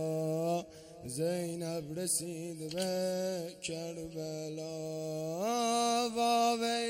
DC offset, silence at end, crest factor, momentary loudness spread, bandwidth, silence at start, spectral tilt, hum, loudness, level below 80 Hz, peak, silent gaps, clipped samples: under 0.1%; 0 s; 16 dB; 11 LU; 16.5 kHz; 0 s; -4 dB/octave; none; -34 LUFS; -70 dBFS; -18 dBFS; none; under 0.1%